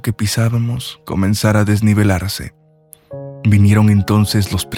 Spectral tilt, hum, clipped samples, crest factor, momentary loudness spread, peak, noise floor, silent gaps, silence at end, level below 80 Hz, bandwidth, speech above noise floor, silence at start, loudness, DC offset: -6 dB/octave; none; under 0.1%; 14 dB; 14 LU; 0 dBFS; -47 dBFS; none; 0 s; -42 dBFS; 16.5 kHz; 33 dB; 0.05 s; -15 LUFS; under 0.1%